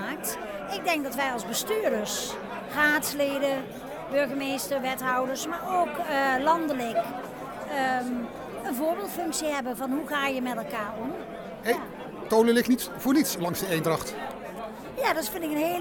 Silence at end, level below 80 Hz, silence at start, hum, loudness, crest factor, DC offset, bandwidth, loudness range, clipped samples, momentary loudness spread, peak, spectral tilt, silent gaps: 0 s; -60 dBFS; 0 s; none; -28 LUFS; 18 dB; under 0.1%; 17 kHz; 4 LU; under 0.1%; 12 LU; -10 dBFS; -3.5 dB/octave; none